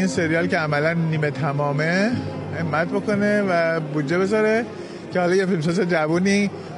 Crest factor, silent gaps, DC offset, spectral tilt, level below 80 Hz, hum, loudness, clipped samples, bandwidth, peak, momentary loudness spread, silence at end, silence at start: 14 dB; none; under 0.1%; -6.5 dB/octave; -58 dBFS; none; -21 LUFS; under 0.1%; 11.5 kHz; -6 dBFS; 5 LU; 0 s; 0 s